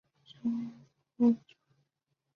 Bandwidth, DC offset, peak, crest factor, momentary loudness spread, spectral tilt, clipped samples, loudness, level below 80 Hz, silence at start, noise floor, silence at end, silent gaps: 5 kHz; under 0.1%; -16 dBFS; 18 dB; 10 LU; -8.5 dB/octave; under 0.1%; -32 LUFS; -78 dBFS; 0.45 s; -83 dBFS; 1 s; none